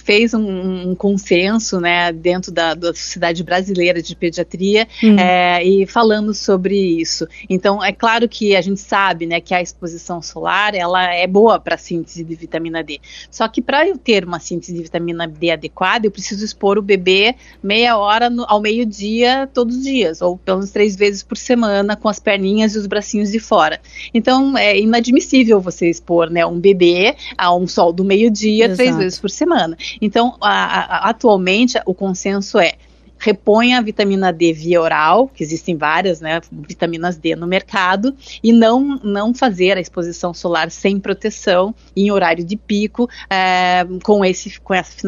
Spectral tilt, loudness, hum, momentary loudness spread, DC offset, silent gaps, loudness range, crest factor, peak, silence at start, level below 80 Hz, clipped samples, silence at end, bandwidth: -4.5 dB/octave; -15 LUFS; none; 9 LU; under 0.1%; none; 4 LU; 16 dB; 0 dBFS; 0.05 s; -46 dBFS; under 0.1%; 0 s; 7.6 kHz